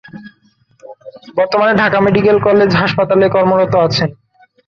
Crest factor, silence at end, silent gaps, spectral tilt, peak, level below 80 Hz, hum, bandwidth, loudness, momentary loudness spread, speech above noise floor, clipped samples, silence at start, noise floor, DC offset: 14 dB; 0.55 s; none; -7 dB/octave; 0 dBFS; -46 dBFS; none; 7.2 kHz; -12 LUFS; 7 LU; 43 dB; under 0.1%; 0.15 s; -54 dBFS; under 0.1%